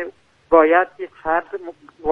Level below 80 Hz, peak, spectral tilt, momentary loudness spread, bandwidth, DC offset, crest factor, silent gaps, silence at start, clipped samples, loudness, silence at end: -52 dBFS; 0 dBFS; -7 dB/octave; 19 LU; 3.9 kHz; under 0.1%; 18 dB; none; 0 s; under 0.1%; -18 LUFS; 0 s